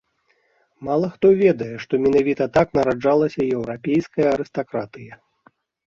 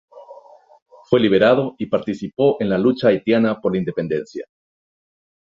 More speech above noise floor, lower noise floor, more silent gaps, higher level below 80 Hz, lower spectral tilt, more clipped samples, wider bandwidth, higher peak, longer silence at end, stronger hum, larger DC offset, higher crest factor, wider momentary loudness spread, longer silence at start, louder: first, 46 dB vs 28 dB; first, -65 dBFS vs -46 dBFS; second, none vs 0.82-0.86 s; about the same, -52 dBFS vs -56 dBFS; about the same, -8 dB/octave vs -7.5 dB/octave; neither; about the same, 7.4 kHz vs 7.4 kHz; second, -4 dBFS vs 0 dBFS; second, 0.8 s vs 1.05 s; neither; neither; about the same, 18 dB vs 20 dB; about the same, 11 LU vs 10 LU; first, 0.8 s vs 0.15 s; about the same, -20 LUFS vs -18 LUFS